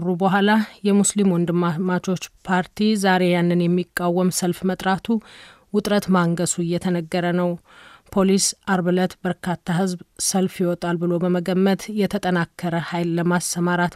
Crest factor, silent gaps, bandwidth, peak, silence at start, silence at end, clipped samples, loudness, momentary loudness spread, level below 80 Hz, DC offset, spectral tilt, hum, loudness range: 16 dB; none; 15 kHz; -4 dBFS; 0 s; 0 s; under 0.1%; -21 LUFS; 7 LU; -56 dBFS; under 0.1%; -5 dB/octave; none; 2 LU